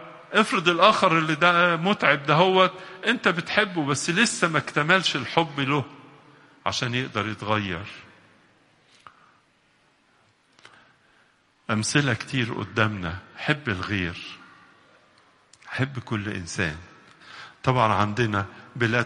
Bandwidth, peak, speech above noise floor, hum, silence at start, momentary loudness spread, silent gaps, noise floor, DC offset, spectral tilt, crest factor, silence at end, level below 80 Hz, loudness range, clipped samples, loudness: 11.5 kHz; -2 dBFS; 40 dB; none; 0 s; 14 LU; none; -63 dBFS; under 0.1%; -4.5 dB/octave; 24 dB; 0 s; -58 dBFS; 12 LU; under 0.1%; -23 LUFS